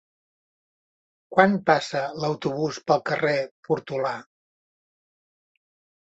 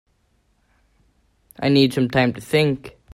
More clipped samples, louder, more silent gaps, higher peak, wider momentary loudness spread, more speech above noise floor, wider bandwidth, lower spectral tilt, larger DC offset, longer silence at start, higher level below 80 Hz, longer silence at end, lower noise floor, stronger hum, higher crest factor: neither; second, -24 LUFS vs -19 LUFS; first, 3.51-3.63 s vs none; about the same, -2 dBFS vs -4 dBFS; about the same, 9 LU vs 7 LU; first, over 67 dB vs 46 dB; second, 8.2 kHz vs 15.5 kHz; about the same, -5.5 dB/octave vs -6.5 dB/octave; neither; second, 1.3 s vs 1.6 s; second, -68 dBFS vs -54 dBFS; first, 1.8 s vs 0.25 s; first, under -90 dBFS vs -64 dBFS; neither; first, 24 dB vs 18 dB